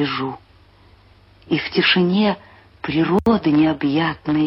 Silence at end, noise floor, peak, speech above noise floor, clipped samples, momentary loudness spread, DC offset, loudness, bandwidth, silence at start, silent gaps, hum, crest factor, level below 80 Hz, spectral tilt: 0 s; -50 dBFS; -6 dBFS; 32 dB; under 0.1%; 13 LU; under 0.1%; -18 LUFS; 5.8 kHz; 0 s; none; none; 14 dB; -48 dBFS; -8 dB/octave